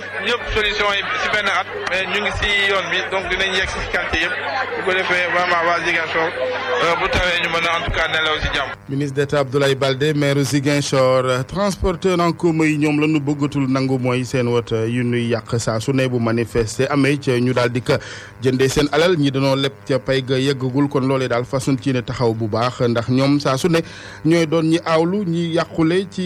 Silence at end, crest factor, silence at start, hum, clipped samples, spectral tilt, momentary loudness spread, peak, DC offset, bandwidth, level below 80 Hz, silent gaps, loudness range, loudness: 0 s; 14 dB; 0 s; none; under 0.1%; -5 dB/octave; 5 LU; -4 dBFS; under 0.1%; 14.5 kHz; -38 dBFS; none; 2 LU; -18 LUFS